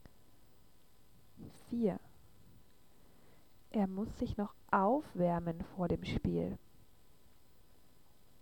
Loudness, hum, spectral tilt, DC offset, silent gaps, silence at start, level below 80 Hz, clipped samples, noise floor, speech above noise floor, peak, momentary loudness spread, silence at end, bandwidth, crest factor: -37 LUFS; none; -8 dB/octave; 0.1%; none; 1.4 s; -56 dBFS; under 0.1%; -67 dBFS; 32 dB; -16 dBFS; 15 LU; 1.85 s; 18.5 kHz; 24 dB